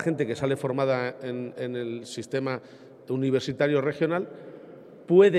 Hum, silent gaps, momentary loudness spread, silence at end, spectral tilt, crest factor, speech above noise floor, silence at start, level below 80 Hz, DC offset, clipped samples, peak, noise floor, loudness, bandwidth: none; none; 20 LU; 0 s; -6.5 dB/octave; 20 dB; 21 dB; 0 s; -68 dBFS; under 0.1%; under 0.1%; -6 dBFS; -47 dBFS; -27 LUFS; 11 kHz